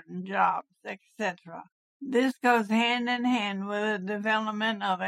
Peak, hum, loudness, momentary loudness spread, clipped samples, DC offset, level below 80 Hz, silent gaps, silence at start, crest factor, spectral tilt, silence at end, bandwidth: -10 dBFS; none; -27 LUFS; 17 LU; under 0.1%; under 0.1%; -86 dBFS; 1.72-2.00 s; 0.1 s; 18 dB; -5 dB/octave; 0 s; 13.5 kHz